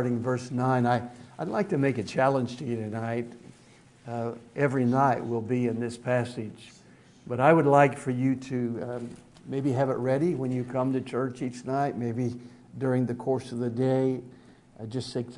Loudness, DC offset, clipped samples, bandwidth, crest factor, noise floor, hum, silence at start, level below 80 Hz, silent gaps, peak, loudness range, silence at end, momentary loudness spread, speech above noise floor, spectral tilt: -28 LUFS; under 0.1%; under 0.1%; 11 kHz; 22 dB; -56 dBFS; none; 0 s; -66 dBFS; none; -6 dBFS; 4 LU; 0 s; 13 LU; 28 dB; -7.5 dB/octave